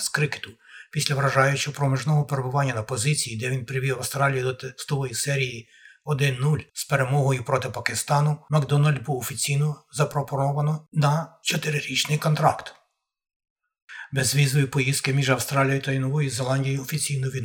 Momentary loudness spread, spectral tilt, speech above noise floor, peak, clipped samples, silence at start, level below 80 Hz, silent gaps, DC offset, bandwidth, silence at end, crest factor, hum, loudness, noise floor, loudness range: 7 LU; -4.5 dB/octave; 45 dB; -2 dBFS; under 0.1%; 0 s; -62 dBFS; 13.36-13.40 s, 13.50-13.56 s, 13.82-13.88 s; under 0.1%; 18.5 kHz; 0 s; 22 dB; none; -24 LUFS; -68 dBFS; 2 LU